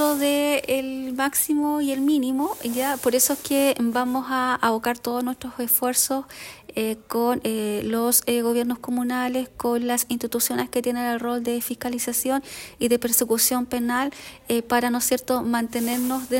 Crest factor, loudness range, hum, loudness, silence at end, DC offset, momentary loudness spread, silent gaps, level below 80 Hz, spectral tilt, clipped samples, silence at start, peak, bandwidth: 18 dB; 2 LU; none; -23 LUFS; 0 s; under 0.1%; 8 LU; none; -58 dBFS; -2.5 dB/octave; under 0.1%; 0 s; -4 dBFS; 16.5 kHz